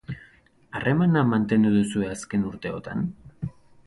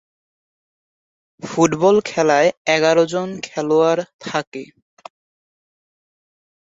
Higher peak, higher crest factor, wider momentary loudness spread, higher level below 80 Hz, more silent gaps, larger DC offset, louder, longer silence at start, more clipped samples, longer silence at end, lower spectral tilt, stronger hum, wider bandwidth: second, -10 dBFS vs -2 dBFS; about the same, 16 dB vs 18 dB; first, 17 LU vs 12 LU; first, -52 dBFS vs -62 dBFS; second, none vs 2.57-2.65 s, 4.14-4.19 s, 4.47-4.52 s; neither; second, -24 LUFS vs -17 LUFS; second, 0.1 s vs 1.45 s; neither; second, 0.35 s vs 2.1 s; first, -7 dB/octave vs -4.5 dB/octave; neither; first, 11.5 kHz vs 8 kHz